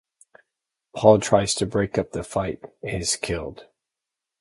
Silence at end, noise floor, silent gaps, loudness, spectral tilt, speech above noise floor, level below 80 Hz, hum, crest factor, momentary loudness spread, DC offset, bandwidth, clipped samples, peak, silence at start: 0.8 s; -86 dBFS; none; -22 LUFS; -4.5 dB/octave; 64 dB; -48 dBFS; none; 24 dB; 15 LU; under 0.1%; 11.5 kHz; under 0.1%; -2 dBFS; 0.95 s